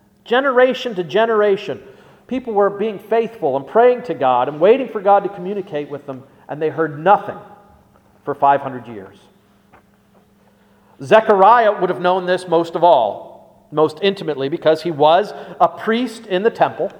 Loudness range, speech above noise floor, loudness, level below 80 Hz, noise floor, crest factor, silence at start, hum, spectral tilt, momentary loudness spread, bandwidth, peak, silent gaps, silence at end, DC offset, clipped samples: 6 LU; 37 dB; -16 LUFS; -64 dBFS; -53 dBFS; 18 dB; 0.25 s; none; -6 dB/octave; 16 LU; 11.5 kHz; 0 dBFS; none; 0 s; under 0.1%; under 0.1%